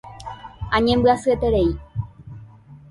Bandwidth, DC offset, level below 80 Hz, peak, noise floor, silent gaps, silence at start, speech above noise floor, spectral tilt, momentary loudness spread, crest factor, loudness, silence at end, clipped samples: 11.5 kHz; under 0.1%; -36 dBFS; -6 dBFS; -44 dBFS; none; 0.05 s; 26 dB; -6.5 dB/octave; 20 LU; 16 dB; -20 LUFS; 0.15 s; under 0.1%